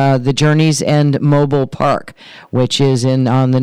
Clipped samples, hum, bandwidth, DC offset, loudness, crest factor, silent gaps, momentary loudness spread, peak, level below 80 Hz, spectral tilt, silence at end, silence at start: under 0.1%; none; 11 kHz; under 0.1%; -13 LUFS; 8 dB; none; 4 LU; -4 dBFS; -44 dBFS; -6 dB/octave; 0 s; 0 s